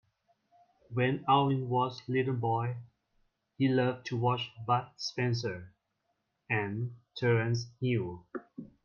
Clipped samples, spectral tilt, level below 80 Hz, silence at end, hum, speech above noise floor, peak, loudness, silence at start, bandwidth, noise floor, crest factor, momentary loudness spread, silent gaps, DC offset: under 0.1%; -6.5 dB/octave; -70 dBFS; 0.2 s; none; 49 dB; -12 dBFS; -32 LUFS; 0.9 s; 7 kHz; -80 dBFS; 20 dB; 13 LU; none; under 0.1%